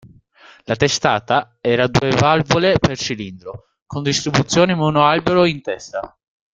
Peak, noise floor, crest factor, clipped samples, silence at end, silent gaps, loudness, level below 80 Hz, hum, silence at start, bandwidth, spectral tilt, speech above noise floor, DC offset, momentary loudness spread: 0 dBFS; -48 dBFS; 18 dB; under 0.1%; 0.45 s; 3.82-3.86 s; -17 LUFS; -46 dBFS; none; 0.7 s; 9.4 kHz; -5 dB/octave; 31 dB; under 0.1%; 14 LU